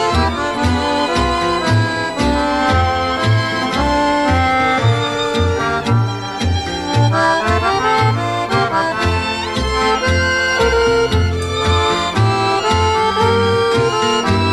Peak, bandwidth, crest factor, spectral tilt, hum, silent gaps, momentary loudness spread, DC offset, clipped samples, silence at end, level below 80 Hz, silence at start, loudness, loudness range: -2 dBFS; 12.5 kHz; 14 dB; -5 dB/octave; none; none; 4 LU; under 0.1%; under 0.1%; 0 s; -30 dBFS; 0 s; -15 LUFS; 1 LU